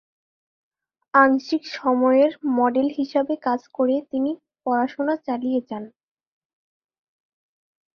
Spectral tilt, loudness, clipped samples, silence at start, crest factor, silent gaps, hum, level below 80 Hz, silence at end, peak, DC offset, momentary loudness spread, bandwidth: -5.5 dB/octave; -22 LUFS; under 0.1%; 1.15 s; 22 dB; none; none; -72 dBFS; 2.05 s; -2 dBFS; under 0.1%; 10 LU; 6.6 kHz